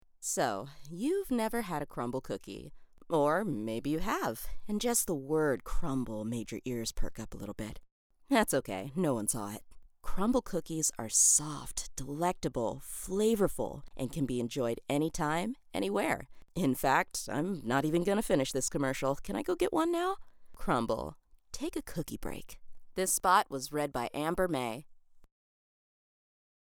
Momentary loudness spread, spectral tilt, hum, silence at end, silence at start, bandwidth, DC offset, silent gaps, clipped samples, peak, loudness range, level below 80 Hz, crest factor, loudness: 13 LU; -4 dB/octave; none; 1.5 s; 0.2 s; over 20 kHz; under 0.1%; 7.91-8.10 s; under 0.1%; -12 dBFS; 5 LU; -48 dBFS; 22 dB; -32 LUFS